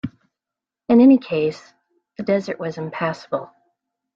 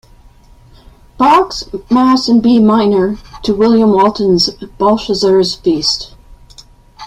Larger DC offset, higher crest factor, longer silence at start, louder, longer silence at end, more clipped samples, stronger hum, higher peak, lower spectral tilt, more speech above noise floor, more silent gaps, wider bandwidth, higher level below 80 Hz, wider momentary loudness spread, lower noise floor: neither; about the same, 16 dB vs 12 dB; second, 0.05 s vs 1.2 s; second, -19 LUFS vs -11 LUFS; first, 0.7 s vs 0 s; neither; neither; second, -4 dBFS vs 0 dBFS; first, -7.5 dB/octave vs -5.5 dB/octave; first, 69 dB vs 31 dB; neither; second, 7.4 kHz vs 11.5 kHz; second, -62 dBFS vs -40 dBFS; first, 19 LU vs 9 LU; first, -87 dBFS vs -42 dBFS